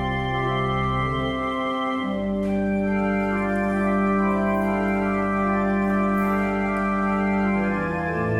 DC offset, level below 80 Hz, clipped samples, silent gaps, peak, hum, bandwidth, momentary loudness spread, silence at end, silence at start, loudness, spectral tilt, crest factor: under 0.1%; -40 dBFS; under 0.1%; none; -12 dBFS; none; 10 kHz; 3 LU; 0 s; 0 s; -23 LUFS; -8 dB/octave; 12 dB